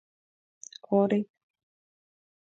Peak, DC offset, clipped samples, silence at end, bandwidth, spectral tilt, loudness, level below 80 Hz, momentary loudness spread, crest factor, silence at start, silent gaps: -12 dBFS; under 0.1%; under 0.1%; 1.3 s; 7.8 kHz; -7 dB/octave; -27 LUFS; -82 dBFS; 22 LU; 20 dB; 0.9 s; none